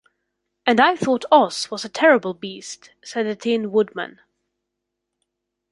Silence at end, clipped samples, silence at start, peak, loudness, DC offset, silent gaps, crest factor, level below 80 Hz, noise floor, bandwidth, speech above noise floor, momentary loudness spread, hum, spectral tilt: 1.6 s; under 0.1%; 0.65 s; -2 dBFS; -19 LUFS; under 0.1%; none; 20 dB; -68 dBFS; -80 dBFS; 11.5 kHz; 61 dB; 16 LU; 50 Hz at -55 dBFS; -4 dB/octave